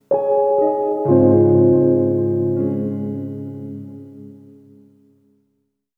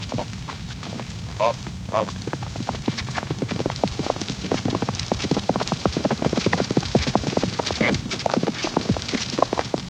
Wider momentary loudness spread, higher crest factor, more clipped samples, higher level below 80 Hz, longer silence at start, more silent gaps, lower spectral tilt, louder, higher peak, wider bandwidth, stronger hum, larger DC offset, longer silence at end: first, 19 LU vs 9 LU; second, 18 dB vs 24 dB; neither; second, -58 dBFS vs -42 dBFS; about the same, 0.1 s vs 0 s; neither; first, -13 dB/octave vs -5 dB/octave; first, -16 LUFS vs -25 LUFS; about the same, -2 dBFS vs 0 dBFS; second, 2.2 kHz vs 12.5 kHz; neither; neither; first, 1.6 s vs 0.1 s